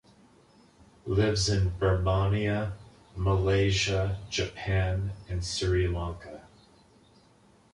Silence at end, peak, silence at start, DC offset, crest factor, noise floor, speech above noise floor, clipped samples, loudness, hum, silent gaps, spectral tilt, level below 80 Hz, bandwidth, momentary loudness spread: 1.35 s; -12 dBFS; 1.05 s; under 0.1%; 16 dB; -60 dBFS; 33 dB; under 0.1%; -28 LUFS; none; none; -5.5 dB/octave; -40 dBFS; 11 kHz; 15 LU